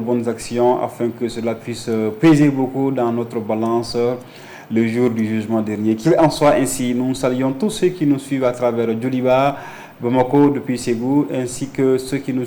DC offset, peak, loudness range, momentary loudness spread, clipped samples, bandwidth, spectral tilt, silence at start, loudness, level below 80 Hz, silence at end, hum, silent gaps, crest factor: under 0.1%; -6 dBFS; 2 LU; 9 LU; under 0.1%; 19 kHz; -6.5 dB/octave; 0 s; -18 LUFS; -50 dBFS; 0 s; none; none; 12 dB